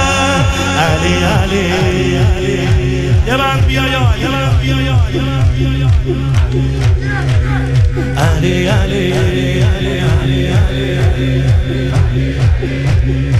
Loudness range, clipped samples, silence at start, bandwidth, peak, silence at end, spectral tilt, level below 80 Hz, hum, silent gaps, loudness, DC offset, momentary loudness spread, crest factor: 1 LU; under 0.1%; 0 s; 13.5 kHz; 0 dBFS; 0 s; -6 dB/octave; -20 dBFS; none; none; -13 LUFS; under 0.1%; 2 LU; 12 dB